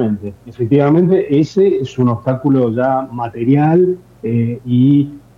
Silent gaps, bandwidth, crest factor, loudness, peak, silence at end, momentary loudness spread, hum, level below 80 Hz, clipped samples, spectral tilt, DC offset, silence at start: none; 7.4 kHz; 12 dB; -14 LUFS; 0 dBFS; 0.2 s; 9 LU; none; -52 dBFS; under 0.1%; -9.5 dB/octave; under 0.1%; 0 s